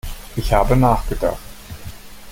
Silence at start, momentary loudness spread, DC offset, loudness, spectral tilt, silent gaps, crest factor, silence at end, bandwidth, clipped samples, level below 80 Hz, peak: 0.05 s; 21 LU; under 0.1%; -19 LUFS; -6.5 dB/octave; none; 18 dB; 0 s; 17 kHz; under 0.1%; -26 dBFS; -2 dBFS